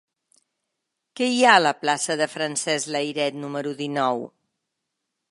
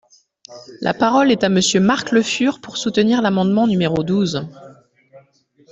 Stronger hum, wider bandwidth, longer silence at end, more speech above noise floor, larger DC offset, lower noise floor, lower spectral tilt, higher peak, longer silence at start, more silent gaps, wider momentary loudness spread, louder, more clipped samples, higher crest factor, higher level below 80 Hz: neither; first, 11.5 kHz vs 8.2 kHz; first, 1.05 s vs 0.55 s; first, 58 dB vs 38 dB; neither; first, -81 dBFS vs -54 dBFS; second, -2.5 dB/octave vs -5 dB/octave; about the same, 0 dBFS vs -2 dBFS; first, 1.15 s vs 0.5 s; neither; first, 14 LU vs 9 LU; second, -22 LUFS vs -17 LUFS; neither; first, 24 dB vs 16 dB; second, -80 dBFS vs -54 dBFS